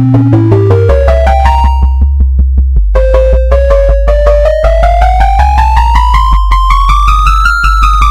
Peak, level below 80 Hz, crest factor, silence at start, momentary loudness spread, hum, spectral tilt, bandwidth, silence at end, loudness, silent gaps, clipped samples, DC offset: 0 dBFS; -8 dBFS; 6 dB; 0 s; 3 LU; none; -7 dB/octave; 9.4 kHz; 0 s; -8 LUFS; none; 2%; under 0.1%